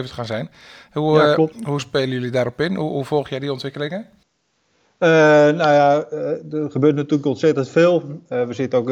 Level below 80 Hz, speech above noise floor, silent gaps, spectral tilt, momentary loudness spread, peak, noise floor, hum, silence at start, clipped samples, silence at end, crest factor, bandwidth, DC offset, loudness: -60 dBFS; 49 dB; none; -6.5 dB/octave; 13 LU; -2 dBFS; -67 dBFS; none; 0 s; under 0.1%; 0 s; 16 dB; 10 kHz; under 0.1%; -18 LUFS